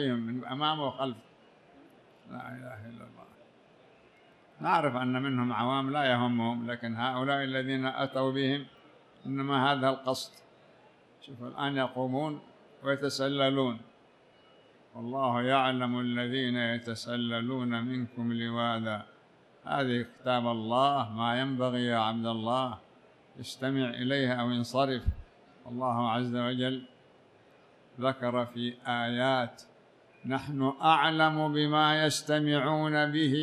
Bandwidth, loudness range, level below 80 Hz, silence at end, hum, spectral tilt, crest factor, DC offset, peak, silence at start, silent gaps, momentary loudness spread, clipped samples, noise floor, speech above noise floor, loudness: 13 kHz; 6 LU; -54 dBFS; 0 s; none; -5.5 dB/octave; 20 dB; under 0.1%; -10 dBFS; 0 s; none; 16 LU; under 0.1%; -61 dBFS; 31 dB; -30 LUFS